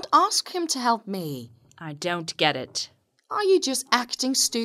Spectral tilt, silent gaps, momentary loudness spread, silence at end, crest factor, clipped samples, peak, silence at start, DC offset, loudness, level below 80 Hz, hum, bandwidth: -2.5 dB/octave; none; 14 LU; 0 s; 24 dB; under 0.1%; -2 dBFS; 0 s; under 0.1%; -24 LUFS; -74 dBFS; none; 16 kHz